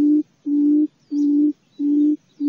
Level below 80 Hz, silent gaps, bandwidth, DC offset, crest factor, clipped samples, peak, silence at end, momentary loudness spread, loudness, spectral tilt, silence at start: -78 dBFS; none; 0.9 kHz; under 0.1%; 8 dB; under 0.1%; -10 dBFS; 0 s; 6 LU; -20 LUFS; -8 dB/octave; 0 s